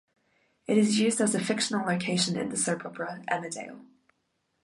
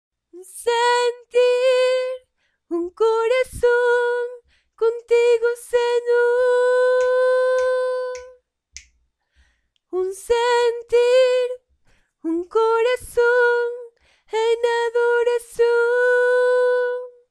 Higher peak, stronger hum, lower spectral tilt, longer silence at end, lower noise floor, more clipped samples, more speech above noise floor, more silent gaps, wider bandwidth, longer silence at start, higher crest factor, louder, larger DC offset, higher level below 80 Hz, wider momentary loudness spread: second, -12 dBFS vs -8 dBFS; neither; first, -4 dB/octave vs -2.5 dB/octave; first, 0.8 s vs 0.2 s; first, -76 dBFS vs -66 dBFS; neither; about the same, 49 dB vs 47 dB; neither; about the same, 11.5 kHz vs 12.5 kHz; first, 0.7 s vs 0.35 s; first, 18 dB vs 12 dB; second, -27 LUFS vs -19 LUFS; neither; second, -72 dBFS vs -54 dBFS; about the same, 13 LU vs 11 LU